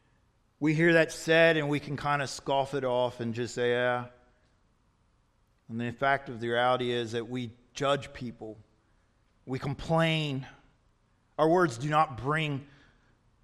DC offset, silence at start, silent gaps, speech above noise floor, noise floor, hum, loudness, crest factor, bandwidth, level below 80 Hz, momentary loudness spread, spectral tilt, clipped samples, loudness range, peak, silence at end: under 0.1%; 0.6 s; none; 40 dB; -69 dBFS; none; -28 LUFS; 20 dB; 13 kHz; -60 dBFS; 16 LU; -5.5 dB/octave; under 0.1%; 7 LU; -10 dBFS; 0.8 s